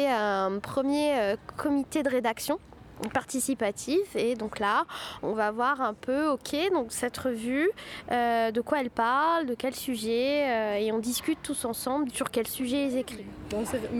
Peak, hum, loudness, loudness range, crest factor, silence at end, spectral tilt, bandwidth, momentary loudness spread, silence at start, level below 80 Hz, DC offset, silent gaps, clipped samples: -12 dBFS; none; -29 LUFS; 2 LU; 16 dB; 0 s; -3.5 dB/octave; 19.5 kHz; 6 LU; 0 s; -58 dBFS; under 0.1%; none; under 0.1%